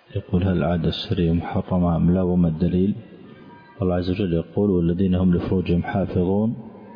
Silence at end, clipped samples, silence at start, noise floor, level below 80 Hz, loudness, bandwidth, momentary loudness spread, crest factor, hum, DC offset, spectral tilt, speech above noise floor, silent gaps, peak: 0 s; under 0.1%; 0.1 s; -44 dBFS; -40 dBFS; -22 LUFS; 5.2 kHz; 5 LU; 12 dB; none; under 0.1%; -10.5 dB/octave; 24 dB; none; -10 dBFS